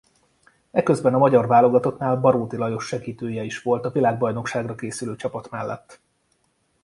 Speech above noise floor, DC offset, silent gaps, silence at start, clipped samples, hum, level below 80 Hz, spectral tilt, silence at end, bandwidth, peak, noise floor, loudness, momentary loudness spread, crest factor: 47 dB; under 0.1%; none; 0.75 s; under 0.1%; none; -60 dBFS; -7 dB/octave; 0.9 s; 11.5 kHz; -2 dBFS; -68 dBFS; -22 LUFS; 14 LU; 20 dB